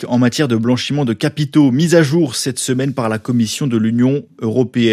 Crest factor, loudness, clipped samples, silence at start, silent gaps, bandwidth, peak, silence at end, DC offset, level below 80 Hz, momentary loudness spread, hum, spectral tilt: 14 dB; -15 LUFS; under 0.1%; 0 s; none; 14.5 kHz; 0 dBFS; 0 s; under 0.1%; -58 dBFS; 6 LU; none; -5.5 dB/octave